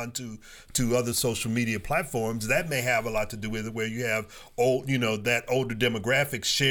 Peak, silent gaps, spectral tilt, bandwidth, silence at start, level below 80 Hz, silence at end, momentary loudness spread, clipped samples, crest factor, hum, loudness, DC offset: -10 dBFS; none; -4 dB/octave; over 20 kHz; 0 s; -48 dBFS; 0 s; 8 LU; under 0.1%; 18 dB; none; -27 LUFS; under 0.1%